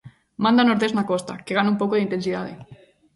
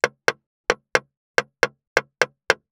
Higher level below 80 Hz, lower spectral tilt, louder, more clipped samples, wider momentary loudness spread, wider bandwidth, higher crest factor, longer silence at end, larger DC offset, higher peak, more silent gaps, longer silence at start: first, -62 dBFS vs -68 dBFS; first, -6 dB/octave vs -1.5 dB/octave; first, -21 LUFS vs -24 LUFS; neither; first, 12 LU vs 4 LU; second, 11.5 kHz vs over 20 kHz; second, 16 dB vs 22 dB; first, 0.4 s vs 0.15 s; neither; second, -6 dBFS vs -2 dBFS; second, none vs 0.46-0.64 s, 1.17-1.34 s, 1.87-1.96 s; about the same, 0.05 s vs 0.05 s